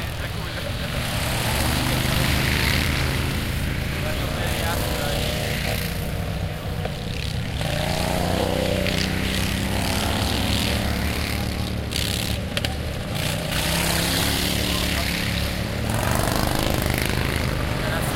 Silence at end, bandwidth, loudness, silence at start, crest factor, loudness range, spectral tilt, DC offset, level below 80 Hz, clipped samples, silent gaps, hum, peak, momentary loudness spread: 0 s; 17 kHz; -23 LUFS; 0 s; 20 dB; 3 LU; -4 dB/octave; under 0.1%; -30 dBFS; under 0.1%; none; none; -4 dBFS; 7 LU